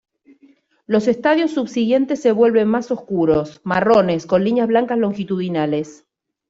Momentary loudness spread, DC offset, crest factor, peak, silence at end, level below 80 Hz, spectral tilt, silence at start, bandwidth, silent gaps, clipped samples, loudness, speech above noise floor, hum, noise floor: 7 LU; under 0.1%; 16 dB; -2 dBFS; 0.55 s; -56 dBFS; -7 dB/octave; 0.9 s; 7.8 kHz; none; under 0.1%; -18 LUFS; 37 dB; none; -54 dBFS